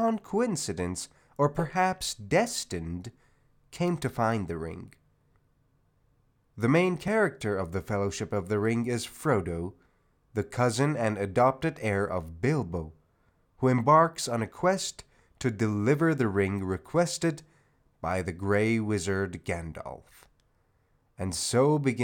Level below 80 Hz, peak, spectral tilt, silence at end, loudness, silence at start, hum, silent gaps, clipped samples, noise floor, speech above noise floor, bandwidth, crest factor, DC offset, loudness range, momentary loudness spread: -58 dBFS; -8 dBFS; -5.5 dB/octave; 0 s; -28 LUFS; 0 s; none; none; under 0.1%; -69 dBFS; 41 dB; 18.5 kHz; 20 dB; under 0.1%; 5 LU; 12 LU